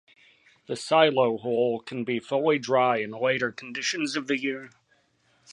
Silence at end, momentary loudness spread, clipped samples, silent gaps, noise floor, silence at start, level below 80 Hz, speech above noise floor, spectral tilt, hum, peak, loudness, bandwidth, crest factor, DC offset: 0 s; 10 LU; under 0.1%; none; -67 dBFS; 0.7 s; -74 dBFS; 41 dB; -4 dB/octave; none; -6 dBFS; -25 LUFS; 11.5 kHz; 20 dB; under 0.1%